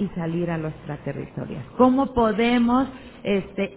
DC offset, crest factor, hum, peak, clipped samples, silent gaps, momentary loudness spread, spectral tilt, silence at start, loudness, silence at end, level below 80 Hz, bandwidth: under 0.1%; 18 dB; none; -6 dBFS; under 0.1%; none; 14 LU; -11 dB/octave; 0 s; -23 LUFS; 0 s; -46 dBFS; 4 kHz